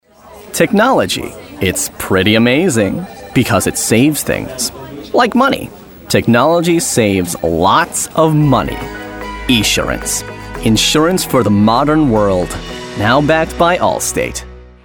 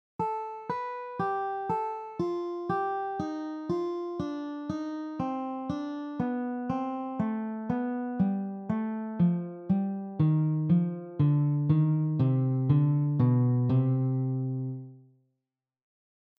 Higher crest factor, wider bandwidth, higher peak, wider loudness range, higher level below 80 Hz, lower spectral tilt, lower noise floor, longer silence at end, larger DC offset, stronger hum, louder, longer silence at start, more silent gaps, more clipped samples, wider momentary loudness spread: about the same, 14 dB vs 16 dB; first, 19.5 kHz vs 6 kHz; first, 0 dBFS vs -14 dBFS; second, 2 LU vs 8 LU; first, -34 dBFS vs -64 dBFS; second, -4.5 dB/octave vs -10.5 dB/octave; second, -37 dBFS vs -87 dBFS; second, 0.2 s vs 1.4 s; neither; neither; first, -13 LUFS vs -30 LUFS; about the same, 0.25 s vs 0.2 s; neither; neither; about the same, 11 LU vs 10 LU